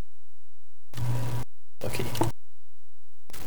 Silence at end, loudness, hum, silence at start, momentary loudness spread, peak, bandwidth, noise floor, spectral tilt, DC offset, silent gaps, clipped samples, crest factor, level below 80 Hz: 0 s; -33 LUFS; none; 0.95 s; 16 LU; -8 dBFS; over 20 kHz; -72 dBFS; -5.5 dB/octave; 8%; none; under 0.1%; 26 dB; -48 dBFS